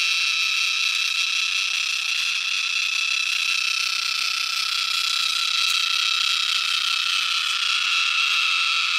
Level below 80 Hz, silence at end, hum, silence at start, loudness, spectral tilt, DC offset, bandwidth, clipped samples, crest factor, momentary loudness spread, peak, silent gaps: -74 dBFS; 0 s; none; 0 s; -20 LUFS; 5 dB/octave; under 0.1%; 16 kHz; under 0.1%; 16 dB; 3 LU; -6 dBFS; none